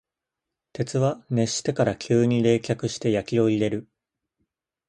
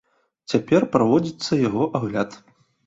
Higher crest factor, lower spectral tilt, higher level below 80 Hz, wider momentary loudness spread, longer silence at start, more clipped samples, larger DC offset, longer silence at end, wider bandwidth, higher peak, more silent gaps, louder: about the same, 18 dB vs 18 dB; about the same, -6 dB/octave vs -6.5 dB/octave; about the same, -58 dBFS vs -56 dBFS; about the same, 7 LU vs 8 LU; first, 0.8 s vs 0.5 s; neither; neither; first, 1.05 s vs 0.5 s; first, 11.5 kHz vs 8 kHz; about the same, -6 dBFS vs -4 dBFS; neither; second, -24 LUFS vs -21 LUFS